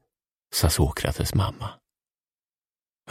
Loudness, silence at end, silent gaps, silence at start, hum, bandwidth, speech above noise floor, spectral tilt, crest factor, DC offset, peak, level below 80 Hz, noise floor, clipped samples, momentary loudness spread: -25 LUFS; 1.35 s; none; 0.5 s; none; 16 kHz; over 66 dB; -4.5 dB/octave; 20 dB; under 0.1%; -8 dBFS; -36 dBFS; under -90 dBFS; under 0.1%; 12 LU